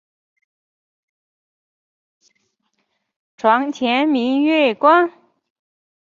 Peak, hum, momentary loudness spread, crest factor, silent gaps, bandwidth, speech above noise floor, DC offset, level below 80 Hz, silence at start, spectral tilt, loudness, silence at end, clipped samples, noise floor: -2 dBFS; none; 5 LU; 18 dB; none; 7.4 kHz; 55 dB; under 0.1%; -72 dBFS; 3.45 s; -4.5 dB/octave; -16 LUFS; 0.95 s; under 0.1%; -71 dBFS